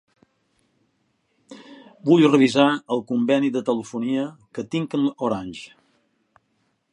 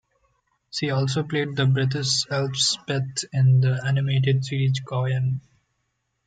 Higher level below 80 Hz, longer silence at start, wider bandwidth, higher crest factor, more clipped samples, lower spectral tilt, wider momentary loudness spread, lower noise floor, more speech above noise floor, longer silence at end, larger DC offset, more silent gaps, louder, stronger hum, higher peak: about the same, -66 dBFS vs -62 dBFS; first, 1.5 s vs 0.75 s; first, 10.5 kHz vs 9.2 kHz; first, 22 dB vs 14 dB; neither; about the same, -6 dB/octave vs -5 dB/octave; first, 19 LU vs 7 LU; second, -70 dBFS vs -75 dBFS; about the same, 49 dB vs 52 dB; first, 1.25 s vs 0.85 s; neither; neither; about the same, -21 LUFS vs -23 LUFS; neither; first, -2 dBFS vs -10 dBFS